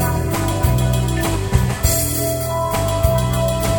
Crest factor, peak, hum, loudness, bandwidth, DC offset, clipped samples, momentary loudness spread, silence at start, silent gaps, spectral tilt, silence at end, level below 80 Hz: 16 dB; -2 dBFS; none; -18 LUFS; over 20 kHz; under 0.1%; under 0.1%; 3 LU; 0 s; none; -5 dB/octave; 0 s; -24 dBFS